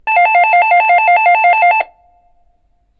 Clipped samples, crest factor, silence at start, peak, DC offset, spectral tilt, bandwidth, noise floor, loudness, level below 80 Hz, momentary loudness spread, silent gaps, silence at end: under 0.1%; 12 dB; 0.05 s; 0 dBFS; under 0.1%; -2.5 dB/octave; 4.7 kHz; -56 dBFS; -9 LUFS; -56 dBFS; 4 LU; none; 1.15 s